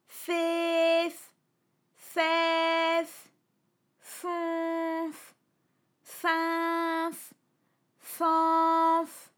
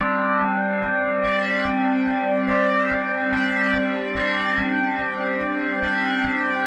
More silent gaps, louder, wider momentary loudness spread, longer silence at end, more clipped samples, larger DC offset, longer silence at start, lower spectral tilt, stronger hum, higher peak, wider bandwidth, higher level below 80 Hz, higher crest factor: neither; second, -28 LUFS vs -21 LUFS; first, 16 LU vs 3 LU; first, 0.15 s vs 0 s; neither; neither; about the same, 0.1 s vs 0 s; second, -1.5 dB/octave vs -6 dB/octave; neither; second, -14 dBFS vs -8 dBFS; first, over 20 kHz vs 8.6 kHz; second, under -90 dBFS vs -48 dBFS; about the same, 16 dB vs 12 dB